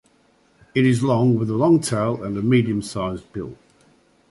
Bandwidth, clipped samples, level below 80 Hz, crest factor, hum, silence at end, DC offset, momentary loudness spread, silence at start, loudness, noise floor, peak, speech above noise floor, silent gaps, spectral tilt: 11.5 kHz; under 0.1%; -52 dBFS; 16 dB; none; 0.75 s; under 0.1%; 14 LU; 0.75 s; -20 LUFS; -59 dBFS; -4 dBFS; 40 dB; none; -6.5 dB/octave